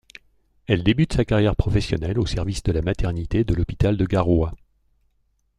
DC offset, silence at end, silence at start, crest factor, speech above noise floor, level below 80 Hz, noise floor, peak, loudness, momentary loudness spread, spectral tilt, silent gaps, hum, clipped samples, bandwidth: under 0.1%; 1.05 s; 0.7 s; 16 dB; 46 dB; -32 dBFS; -67 dBFS; -6 dBFS; -22 LUFS; 5 LU; -7 dB/octave; none; none; under 0.1%; 10.5 kHz